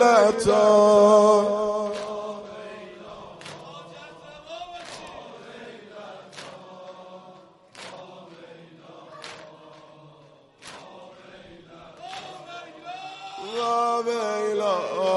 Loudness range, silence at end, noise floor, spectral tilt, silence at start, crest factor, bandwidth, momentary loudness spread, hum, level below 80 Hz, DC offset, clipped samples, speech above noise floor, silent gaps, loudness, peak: 23 LU; 0 s; -53 dBFS; -4.5 dB/octave; 0 s; 20 dB; 11.5 kHz; 28 LU; none; -62 dBFS; under 0.1%; under 0.1%; 36 dB; none; -20 LUFS; -6 dBFS